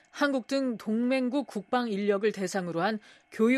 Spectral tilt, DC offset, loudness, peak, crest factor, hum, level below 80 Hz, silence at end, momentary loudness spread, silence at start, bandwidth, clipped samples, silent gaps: -5.5 dB/octave; under 0.1%; -29 LUFS; -14 dBFS; 16 dB; none; -80 dBFS; 0 s; 5 LU; 0.15 s; 13 kHz; under 0.1%; none